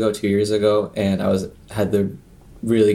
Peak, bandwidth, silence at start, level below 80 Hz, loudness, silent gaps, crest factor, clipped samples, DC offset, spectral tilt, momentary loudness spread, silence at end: -4 dBFS; 13.5 kHz; 0 s; -50 dBFS; -20 LUFS; none; 14 dB; under 0.1%; under 0.1%; -6.5 dB/octave; 9 LU; 0 s